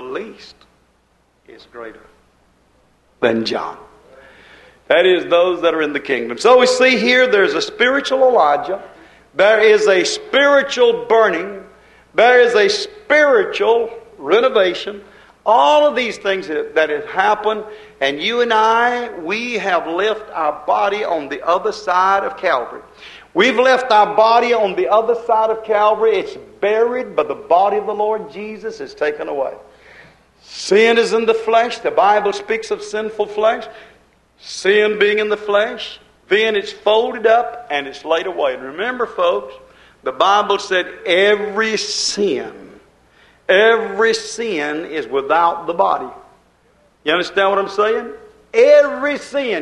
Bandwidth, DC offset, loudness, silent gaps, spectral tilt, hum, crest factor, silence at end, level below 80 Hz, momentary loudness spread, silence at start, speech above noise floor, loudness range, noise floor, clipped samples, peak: 11 kHz; under 0.1%; -15 LUFS; none; -3 dB/octave; none; 16 dB; 0 s; -58 dBFS; 13 LU; 0 s; 43 dB; 5 LU; -58 dBFS; under 0.1%; 0 dBFS